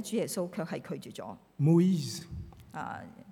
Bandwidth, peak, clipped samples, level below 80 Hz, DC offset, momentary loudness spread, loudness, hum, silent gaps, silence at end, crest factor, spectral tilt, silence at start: 16 kHz; -14 dBFS; under 0.1%; -60 dBFS; under 0.1%; 20 LU; -31 LUFS; none; none; 0 s; 18 dB; -6.5 dB/octave; 0 s